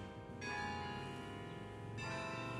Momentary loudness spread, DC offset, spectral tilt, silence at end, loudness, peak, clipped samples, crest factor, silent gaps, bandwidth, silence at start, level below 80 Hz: 7 LU; under 0.1%; -5 dB/octave; 0 s; -45 LUFS; -30 dBFS; under 0.1%; 16 dB; none; 13 kHz; 0 s; -66 dBFS